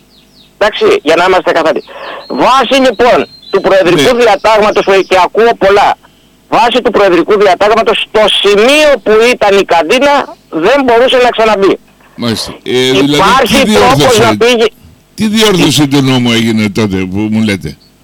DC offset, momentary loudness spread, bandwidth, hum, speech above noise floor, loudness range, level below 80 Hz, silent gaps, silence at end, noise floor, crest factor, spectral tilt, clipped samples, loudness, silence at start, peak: under 0.1%; 8 LU; 19 kHz; none; 35 dB; 2 LU; -36 dBFS; none; 0.3 s; -42 dBFS; 6 dB; -4.5 dB/octave; under 0.1%; -7 LUFS; 0.6 s; -2 dBFS